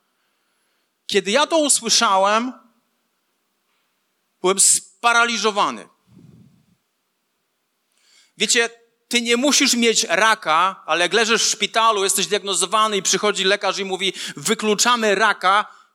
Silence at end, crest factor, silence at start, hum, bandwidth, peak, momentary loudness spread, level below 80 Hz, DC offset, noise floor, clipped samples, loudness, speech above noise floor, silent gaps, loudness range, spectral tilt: 0.25 s; 18 dB; 1.1 s; none; 17 kHz; -2 dBFS; 8 LU; -84 dBFS; under 0.1%; -71 dBFS; under 0.1%; -17 LUFS; 53 dB; none; 7 LU; -1 dB/octave